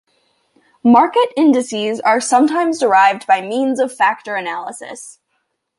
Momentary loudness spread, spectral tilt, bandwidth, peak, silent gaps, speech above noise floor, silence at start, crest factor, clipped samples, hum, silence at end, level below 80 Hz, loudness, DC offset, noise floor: 14 LU; -3.5 dB/octave; 11.5 kHz; -2 dBFS; none; 55 dB; 0.85 s; 14 dB; under 0.1%; none; 0.7 s; -68 dBFS; -15 LUFS; under 0.1%; -69 dBFS